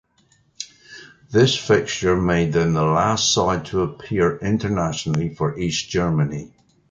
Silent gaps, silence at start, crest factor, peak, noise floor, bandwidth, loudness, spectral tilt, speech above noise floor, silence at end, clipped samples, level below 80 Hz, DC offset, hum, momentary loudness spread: none; 0.6 s; 18 dB; -4 dBFS; -60 dBFS; 9.2 kHz; -20 LUFS; -5 dB/octave; 40 dB; 0.45 s; under 0.1%; -42 dBFS; under 0.1%; none; 7 LU